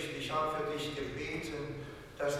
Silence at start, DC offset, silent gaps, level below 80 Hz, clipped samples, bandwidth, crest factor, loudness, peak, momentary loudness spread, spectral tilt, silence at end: 0 s; under 0.1%; none; -58 dBFS; under 0.1%; 16 kHz; 14 dB; -37 LUFS; -22 dBFS; 9 LU; -4.5 dB/octave; 0 s